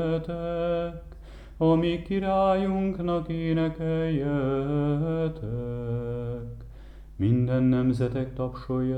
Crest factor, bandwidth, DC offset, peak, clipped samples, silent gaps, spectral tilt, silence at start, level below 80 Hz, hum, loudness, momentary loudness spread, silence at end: 14 dB; 9.2 kHz; under 0.1%; -12 dBFS; under 0.1%; none; -9.5 dB/octave; 0 s; -44 dBFS; none; -27 LUFS; 14 LU; 0 s